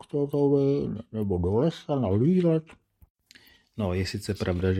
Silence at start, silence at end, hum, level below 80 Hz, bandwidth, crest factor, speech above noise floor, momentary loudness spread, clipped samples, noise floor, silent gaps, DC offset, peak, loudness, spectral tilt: 0.15 s; 0 s; none; -54 dBFS; 13.5 kHz; 14 dB; 31 dB; 9 LU; under 0.1%; -56 dBFS; 3.10-3.15 s; under 0.1%; -12 dBFS; -26 LUFS; -8 dB/octave